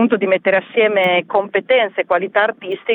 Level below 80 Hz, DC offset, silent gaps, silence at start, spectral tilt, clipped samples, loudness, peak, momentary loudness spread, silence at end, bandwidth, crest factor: -64 dBFS; under 0.1%; none; 0 s; -7 dB/octave; under 0.1%; -16 LUFS; -2 dBFS; 4 LU; 0 s; 16 kHz; 14 dB